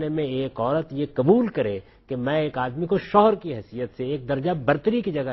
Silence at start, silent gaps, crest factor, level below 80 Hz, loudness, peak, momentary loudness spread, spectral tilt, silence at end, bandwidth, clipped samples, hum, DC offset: 0 s; none; 20 dB; -54 dBFS; -24 LUFS; -4 dBFS; 11 LU; -10 dB/octave; 0 s; 6 kHz; under 0.1%; none; under 0.1%